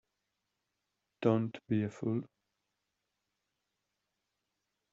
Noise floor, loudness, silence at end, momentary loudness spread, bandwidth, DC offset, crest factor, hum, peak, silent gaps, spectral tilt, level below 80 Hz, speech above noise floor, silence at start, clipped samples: -86 dBFS; -35 LUFS; 2.65 s; 6 LU; 7.4 kHz; under 0.1%; 24 dB; none; -14 dBFS; none; -8 dB/octave; -78 dBFS; 53 dB; 1.2 s; under 0.1%